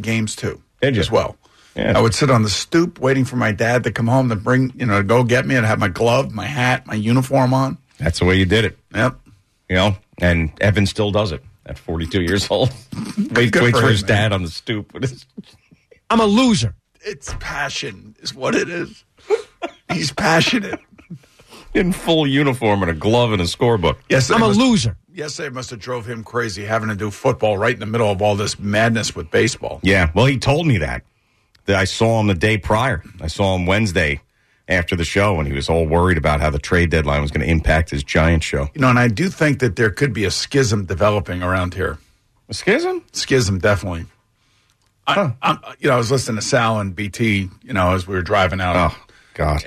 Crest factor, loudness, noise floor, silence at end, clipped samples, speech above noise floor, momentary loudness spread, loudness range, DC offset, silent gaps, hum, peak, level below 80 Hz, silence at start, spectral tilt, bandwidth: 14 dB; -18 LUFS; -60 dBFS; 0 s; under 0.1%; 43 dB; 11 LU; 4 LU; under 0.1%; none; none; -4 dBFS; -34 dBFS; 0 s; -5.5 dB/octave; 13.5 kHz